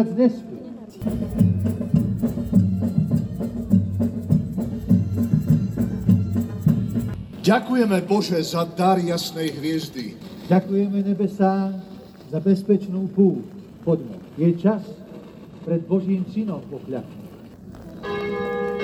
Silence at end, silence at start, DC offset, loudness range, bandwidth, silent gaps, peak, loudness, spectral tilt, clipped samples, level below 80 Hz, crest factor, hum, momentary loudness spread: 0 s; 0 s; under 0.1%; 4 LU; over 20 kHz; none; -6 dBFS; -22 LUFS; -7.5 dB/octave; under 0.1%; -46 dBFS; 16 dB; none; 17 LU